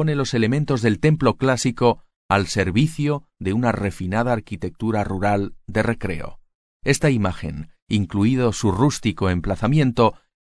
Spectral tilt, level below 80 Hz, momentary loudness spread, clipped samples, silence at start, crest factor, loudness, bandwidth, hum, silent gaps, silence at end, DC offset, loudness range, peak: -6 dB/octave; -40 dBFS; 8 LU; under 0.1%; 0 s; 18 dB; -21 LUFS; 11 kHz; none; 2.16-2.29 s, 6.55-6.80 s, 7.82-7.87 s; 0.3 s; under 0.1%; 3 LU; -4 dBFS